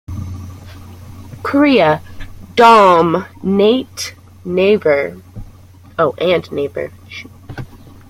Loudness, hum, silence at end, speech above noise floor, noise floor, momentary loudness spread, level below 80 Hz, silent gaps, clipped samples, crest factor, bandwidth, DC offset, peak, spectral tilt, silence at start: -13 LUFS; none; 0.35 s; 27 dB; -40 dBFS; 23 LU; -42 dBFS; none; under 0.1%; 16 dB; 16 kHz; under 0.1%; 0 dBFS; -5.5 dB/octave; 0.1 s